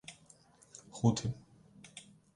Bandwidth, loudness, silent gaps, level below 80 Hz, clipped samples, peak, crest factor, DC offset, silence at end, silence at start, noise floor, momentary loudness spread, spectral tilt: 11.5 kHz; -34 LUFS; none; -62 dBFS; under 0.1%; -14 dBFS; 24 dB; under 0.1%; 0.35 s; 0.1 s; -63 dBFS; 24 LU; -6 dB/octave